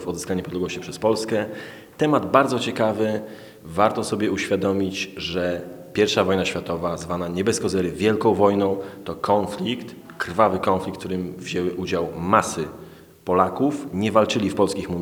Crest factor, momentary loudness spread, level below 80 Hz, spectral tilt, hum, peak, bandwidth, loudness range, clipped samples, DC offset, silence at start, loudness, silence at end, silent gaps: 22 dB; 11 LU; -54 dBFS; -5 dB/octave; none; 0 dBFS; over 20 kHz; 2 LU; under 0.1%; under 0.1%; 0 s; -23 LUFS; 0 s; none